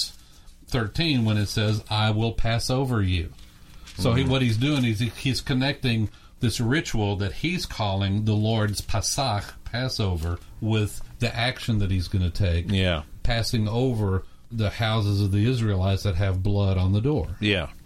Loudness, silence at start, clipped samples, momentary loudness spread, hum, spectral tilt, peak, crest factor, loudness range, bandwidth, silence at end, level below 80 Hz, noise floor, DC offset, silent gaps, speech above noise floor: -25 LUFS; 0 s; under 0.1%; 6 LU; none; -5.5 dB/octave; -8 dBFS; 16 dB; 2 LU; 15 kHz; 0.05 s; -38 dBFS; -48 dBFS; under 0.1%; none; 24 dB